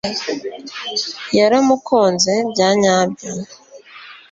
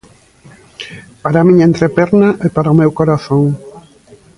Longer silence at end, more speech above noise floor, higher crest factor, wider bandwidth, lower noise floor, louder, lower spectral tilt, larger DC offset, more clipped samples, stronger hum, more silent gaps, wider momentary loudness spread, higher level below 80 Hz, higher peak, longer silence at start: second, 0.15 s vs 0.6 s; second, 23 dB vs 33 dB; about the same, 16 dB vs 12 dB; second, 8.2 kHz vs 11 kHz; about the same, -40 dBFS vs -43 dBFS; second, -16 LUFS vs -11 LUFS; second, -3.5 dB/octave vs -8.5 dB/octave; neither; neither; neither; neither; second, 16 LU vs 20 LU; second, -58 dBFS vs -46 dBFS; about the same, -2 dBFS vs 0 dBFS; second, 0.05 s vs 0.8 s